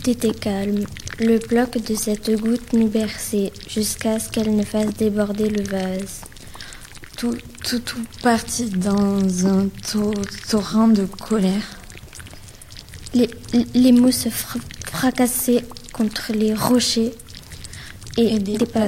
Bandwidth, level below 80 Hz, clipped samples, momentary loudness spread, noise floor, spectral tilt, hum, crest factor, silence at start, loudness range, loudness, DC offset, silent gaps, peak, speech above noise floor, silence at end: 16.5 kHz; -44 dBFS; under 0.1%; 19 LU; -39 dBFS; -5 dB/octave; none; 20 dB; 0 s; 5 LU; -20 LUFS; under 0.1%; none; 0 dBFS; 20 dB; 0 s